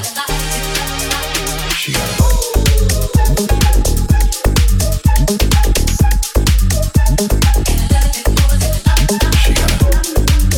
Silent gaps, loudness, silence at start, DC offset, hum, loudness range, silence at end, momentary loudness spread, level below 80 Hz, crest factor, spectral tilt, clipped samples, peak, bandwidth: none; -14 LUFS; 0 s; under 0.1%; none; 1 LU; 0 s; 4 LU; -14 dBFS; 12 dB; -4 dB/octave; under 0.1%; 0 dBFS; 18 kHz